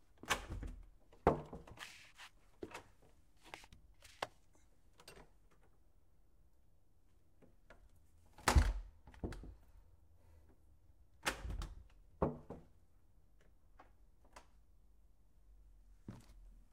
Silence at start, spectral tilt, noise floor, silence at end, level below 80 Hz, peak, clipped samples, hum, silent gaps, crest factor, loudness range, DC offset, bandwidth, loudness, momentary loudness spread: 0.25 s; -4.5 dB/octave; -73 dBFS; 0.15 s; -50 dBFS; -14 dBFS; under 0.1%; none; none; 32 dB; 15 LU; under 0.1%; 16 kHz; -42 LUFS; 25 LU